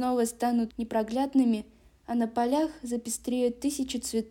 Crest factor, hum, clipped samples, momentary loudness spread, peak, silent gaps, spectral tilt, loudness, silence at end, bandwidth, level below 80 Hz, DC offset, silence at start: 14 dB; none; under 0.1%; 7 LU; -14 dBFS; none; -4 dB/octave; -29 LUFS; 0 s; 17 kHz; -58 dBFS; under 0.1%; 0 s